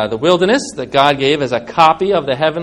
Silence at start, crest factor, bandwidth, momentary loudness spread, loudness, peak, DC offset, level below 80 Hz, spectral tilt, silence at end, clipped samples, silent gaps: 0 s; 14 dB; 12 kHz; 5 LU; -14 LUFS; 0 dBFS; under 0.1%; -48 dBFS; -4.5 dB/octave; 0 s; 0.3%; none